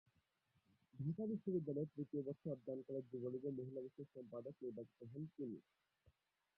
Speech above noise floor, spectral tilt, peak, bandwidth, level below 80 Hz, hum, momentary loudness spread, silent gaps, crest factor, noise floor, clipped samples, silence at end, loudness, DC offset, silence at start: 36 dB; -12.5 dB/octave; -32 dBFS; 5 kHz; -86 dBFS; none; 11 LU; none; 18 dB; -83 dBFS; under 0.1%; 0.95 s; -48 LUFS; under 0.1%; 0.95 s